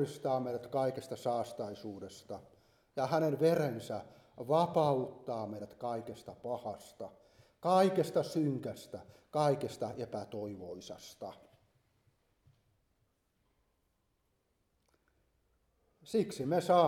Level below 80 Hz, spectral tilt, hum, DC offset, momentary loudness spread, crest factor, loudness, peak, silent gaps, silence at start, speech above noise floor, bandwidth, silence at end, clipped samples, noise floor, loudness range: -76 dBFS; -6.5 dB/octave; none; under 0.1%; 18 LU; 22 dB; -35 LUFS; -14 dBFS; none; 0 s; 44 dB; 17.5 kHz; 0 s; under 0.1%; -79 dBFS; 12 LU